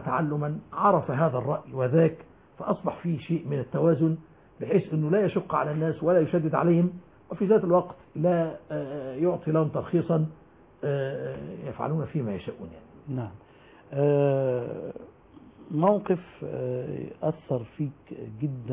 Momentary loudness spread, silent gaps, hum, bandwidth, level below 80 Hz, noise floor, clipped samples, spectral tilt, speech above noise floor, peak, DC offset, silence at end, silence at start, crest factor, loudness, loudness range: 14 LU; none; none; 3.8 kHz; -60 dBFS; -51 dBFS; under 0.1%; -12.5 dB/octave; 25 dB; -10 dBFS; under 0.1%; 0 s; 0 s; 18 dB; -27 LUFS; 5 LU